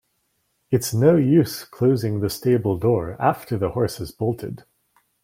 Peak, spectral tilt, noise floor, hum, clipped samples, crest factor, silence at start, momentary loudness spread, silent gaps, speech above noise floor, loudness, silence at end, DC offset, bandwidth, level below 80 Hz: -4 dBFS; -7 dB/octave; -70 dBFS; none; under 0.1%; 18 dB; 0.7 s; 10 LU; none; 50 dB; -21 LUFS; 0.65 s; under 0.1%; 16.5 kHz; -52 dBFS